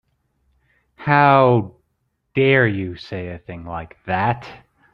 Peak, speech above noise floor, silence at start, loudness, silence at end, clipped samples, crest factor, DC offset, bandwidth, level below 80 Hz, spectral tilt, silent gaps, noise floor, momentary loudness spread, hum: -2 dBFS; 53 dB; 1 s; -18 LUFS; 0.35 s; under 0.1%; 18 dB; under 0.1%; 6 kHz; -52 dBFS; -9 dB/octave; none; -71 dBFS; 19 LU; none